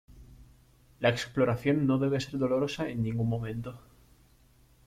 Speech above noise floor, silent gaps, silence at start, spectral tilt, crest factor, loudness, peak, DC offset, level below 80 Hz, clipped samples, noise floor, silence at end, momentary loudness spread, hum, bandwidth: 33 dB; none; 0.1 s; -7 dB/octave; 20 dB; -30 LUFS; -12 dBFS; under 0.1%; -56 dBFS; under 0.1%; -61 dBFS; 1.1 s; 8 LU; none; 14.5 kHz